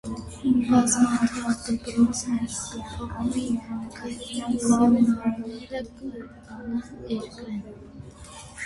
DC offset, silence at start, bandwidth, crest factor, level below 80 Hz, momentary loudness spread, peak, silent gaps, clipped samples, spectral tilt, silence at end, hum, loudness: under 0.1%; 0.05 s; 11.5 kHz; 18 dB; -48 dBFS; 21 LU; -8 dBFS; none; under 0.1%; -4.5 dB/octave; 0 s; none; -25 LUFS